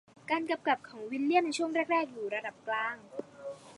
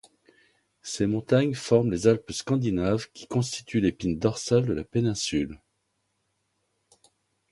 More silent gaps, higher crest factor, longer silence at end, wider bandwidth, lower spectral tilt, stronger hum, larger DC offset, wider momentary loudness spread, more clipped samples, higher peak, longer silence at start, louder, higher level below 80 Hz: neither; about the same, 20 dB vs 22 dB; second, 0 s vs 1.95 s; about the same, 11.5 kHz vs 11.5 kHz; second, -3.5 dB/octave vs -6 dB/octave; neither; neither; first, 14 LU vs 7 LU; neither; second, -14 dBFS vs -6 dBFS; second, 0.25 s vs 0.85 s; second, -32 LUFS vs -26 LUFS; second, -82 dBFS vs -52 dBFS